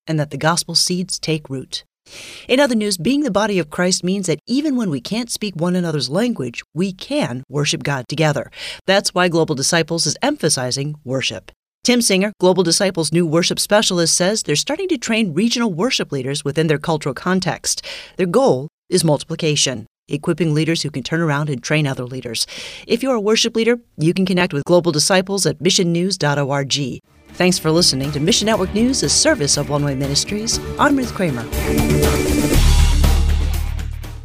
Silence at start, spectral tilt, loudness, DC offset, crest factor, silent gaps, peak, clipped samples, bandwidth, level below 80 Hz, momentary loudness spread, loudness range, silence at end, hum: 0.05 s; -4 dB/octave; -17 LUFS; under 0.1%; 16 dB; 6.65-6.69 s, 8.81-8.85 s, 11.56-11.63 s, 11.74-11.81 s, 18.73-18.83 s, 19.87-20.02 s; -2 dBFS; under 0.1%; 16 kHz; -28 dBFS; 8 LU; 4 LU; 0 s; none